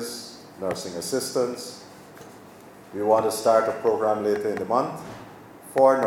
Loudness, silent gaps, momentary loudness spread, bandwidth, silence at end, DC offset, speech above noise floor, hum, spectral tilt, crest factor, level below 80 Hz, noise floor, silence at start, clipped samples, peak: -24 LUFS; none; 24 LU; 16.5 kHz; 0 s; under 0.1%; 23 dB; none; -4 dB/octave; 20 dB; -66 dBFS; -46 dBFS; 0 s; under 0.1%; -4 dBFS